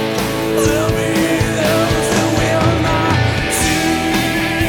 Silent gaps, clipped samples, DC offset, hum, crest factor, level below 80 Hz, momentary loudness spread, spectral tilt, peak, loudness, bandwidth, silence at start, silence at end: none; under 0.1%; under 0.1%; none; 14 dB; -30 dBFS; 2 LU; -4.5 dB/octave; -2 dBFS; -15 LUFS; 19.5 kHz; 0 s; 0 s